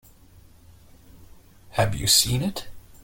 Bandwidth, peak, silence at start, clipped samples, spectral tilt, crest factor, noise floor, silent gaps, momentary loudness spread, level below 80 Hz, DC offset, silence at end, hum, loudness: 17 kHz; -4 dBFS; 1.2 s; under 0.1%; -3 dB/octave; 22 dB; -51 dBFS; none; 14 LU; -46 dBFS; under 0.1%; 0.25 s; none; -21 LUFS